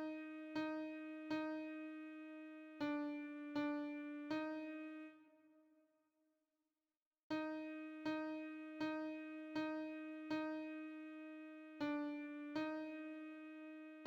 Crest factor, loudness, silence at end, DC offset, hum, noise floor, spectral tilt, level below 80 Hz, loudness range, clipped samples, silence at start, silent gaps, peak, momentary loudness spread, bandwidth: 16 dB; -47 LUFS; 0 s; under 0.1%; none; under -90 dBFS; -6 dB/octave; -88 dBFS; 5 LU; under 0.1%; 0 s; 7.02-7.11 s, 7.23-7.30 s; -32 dBFS; 10 LU; 7.4 kHz